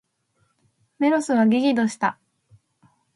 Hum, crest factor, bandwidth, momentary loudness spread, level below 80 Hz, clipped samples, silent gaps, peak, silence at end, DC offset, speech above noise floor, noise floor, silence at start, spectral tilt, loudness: none; 16 dB; 11.5 kHz; 7 LU; -72 dBFS; under 0.1%; none; -8 dBFS; 1.05 s; under 0.1%; 49 dB; -69 dBFS; 1 s; -5.5 dB/octave; -21 LUFS